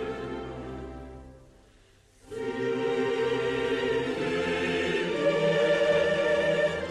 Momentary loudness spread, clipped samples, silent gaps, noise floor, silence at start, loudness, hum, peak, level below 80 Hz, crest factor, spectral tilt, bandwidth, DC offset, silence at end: 16 LU; under 0.1%; none; -59 dBFS; 0 s; -27 LUFS; none; -14 dBFS; -54 dBFS; 14 dB; -5 dB/octave; 11.5 kHz; under 0.1%; 0 s